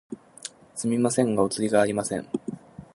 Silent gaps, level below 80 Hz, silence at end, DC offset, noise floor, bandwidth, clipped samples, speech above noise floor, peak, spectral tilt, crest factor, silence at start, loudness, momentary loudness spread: none; -62 dBFS; 0.1 s; under 0.1%; -44 dBFS; 11.5 kHz; under 0.1%; 20 dB; -6 dBFS; -5 dB/octave; 20 dB; 0.1 s; -25 LUFS; 17 LU